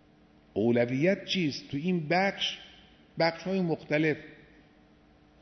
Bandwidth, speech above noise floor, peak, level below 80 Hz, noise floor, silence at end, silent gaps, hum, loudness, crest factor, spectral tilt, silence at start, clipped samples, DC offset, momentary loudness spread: 6.4 kHz; 31 dB; -12 dBFS; -66 dBFS; -60 dBFS; 1.05 s; none; none; -29 LUFS; 18 dB; -6 dB/octave; 0.55 s; under 0.1%; under 0.1%; 8 LU